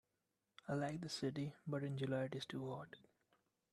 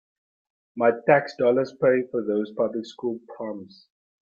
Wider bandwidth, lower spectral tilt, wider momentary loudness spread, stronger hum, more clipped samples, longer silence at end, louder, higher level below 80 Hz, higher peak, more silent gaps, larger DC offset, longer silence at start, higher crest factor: first, 12.5 kHz vs 7.2 kHz; about the same, -6 dB/octave vs -7 dB/octave; second, 12 LU vs 15 LU; neither; neither; about the same, 0.75 s vs 0.65 s; second, -45 LUFS vs -24 LUFS; second, -80 dBFS vs -70 dBFS; second, -28 dBFS vs -6 dBFS; neither; neither; about the same, 0.65 s vs 0.75 s; about the same, 18 dB vs 20 dB